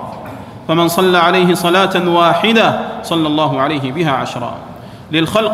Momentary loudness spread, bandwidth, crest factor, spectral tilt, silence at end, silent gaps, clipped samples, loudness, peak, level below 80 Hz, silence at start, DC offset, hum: 18 LU; 16 kHz; 14 dB; -5 dB/octave; 0 s; none; under 0.1%; -13 LUFS; 0 dBFS; -50 dBFS; 0 s; under 0.1%; none